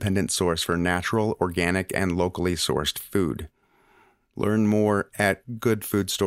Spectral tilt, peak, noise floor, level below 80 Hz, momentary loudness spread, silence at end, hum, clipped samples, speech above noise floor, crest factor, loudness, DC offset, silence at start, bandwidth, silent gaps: -4.5 dB/octave; -6 dBFS; -60 dBFS; -52 dBFS; 5 LU; 0 s; none; under 0.1%; 36 dB; 18 dB; -24 LUFS; under 0.1%; 0 s; 16 kHz; none